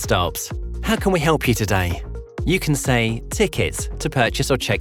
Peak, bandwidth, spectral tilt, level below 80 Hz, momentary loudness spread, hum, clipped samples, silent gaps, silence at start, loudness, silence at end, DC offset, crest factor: -2 dBFS; 19.5 kHz; -4.5 dB/octave; -32 dBFS; 9 LU; none; under 0.1%; none; 0 s; -21 LUFS; 0 s; under 0.1%; 18 dB